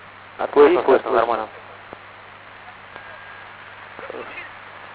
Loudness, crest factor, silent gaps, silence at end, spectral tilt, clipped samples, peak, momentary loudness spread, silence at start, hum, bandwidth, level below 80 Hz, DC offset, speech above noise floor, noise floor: -18 LUFS; 22 dB; none; 0 s; -9 dB/octave; under 0.1%; -2 dBFS; 25 LU; 0.4 s; 50 Hz at -60 dBFS; 4 kHz; -60 dBFS; under 0.1%; 25 dB; -42 dBFS